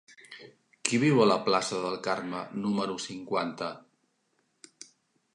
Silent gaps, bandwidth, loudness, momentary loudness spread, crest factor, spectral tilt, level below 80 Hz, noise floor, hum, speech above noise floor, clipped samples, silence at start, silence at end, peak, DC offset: none; 11 kHz; -29 LUFS; 25 LU; 26 dB; -4.5 dB/octave; -74 dBFS; -74 dBFS; none; 46 dB; under 0.1%; 0.1 s; 1.55 s; -6 dBFS; under 0.1%